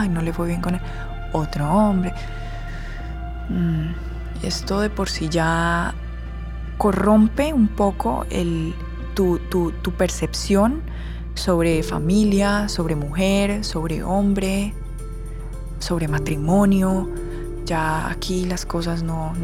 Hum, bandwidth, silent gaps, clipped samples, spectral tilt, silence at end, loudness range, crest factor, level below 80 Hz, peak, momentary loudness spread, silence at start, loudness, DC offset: none; 15.5 kHz; none; under 0.1%; -6 dB/octave; 0 s; 4 LU; 16 dB; -30 dBFS; -6 dBFS; 15 LU; 0 s; -22 LUFS; under 0.1%